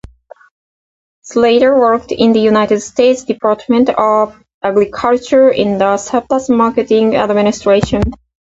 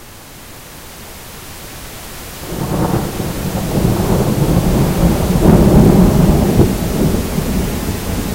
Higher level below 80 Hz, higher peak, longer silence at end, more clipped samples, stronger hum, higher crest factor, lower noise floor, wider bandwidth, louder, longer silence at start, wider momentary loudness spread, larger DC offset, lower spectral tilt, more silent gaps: second, -36 dBFS vs -22 dBFS; about the same, 0 dBFS vs 0 dBFS; first, 0.35 s vs 0 s; neither; neither; about the same, 12 dB vs 14 dB; about the same, -37 dBFS vs -35 dBFS; second, 8 kHz vs 16 kHz; about the same, -12 LUFS vs -14 LUFS; first, 1.25 s vs 0 s; second, 6 LU vs 22 LU; neither; about the same, -5.5 dB/octave vs -6.5 dB/octave; first, 4.54-4.61 s vs none